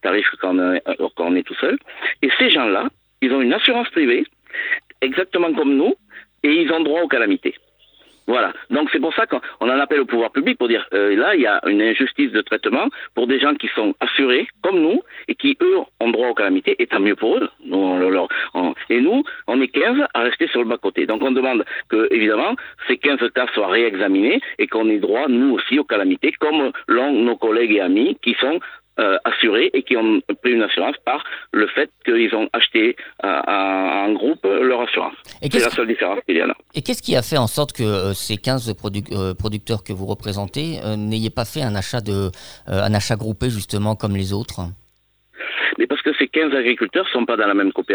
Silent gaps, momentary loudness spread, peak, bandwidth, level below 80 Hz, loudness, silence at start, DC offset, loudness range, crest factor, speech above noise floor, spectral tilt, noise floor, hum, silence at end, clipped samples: none; 8 LU; -2 dBFS; over 20 kHz; -52 dBFS; -18 LUFS; 0.05 s; under 0.1%; 5 LU; 18 dB; 43 dB; -5 dB/octave; -61 dBFS; none; 0 s; under 0.1%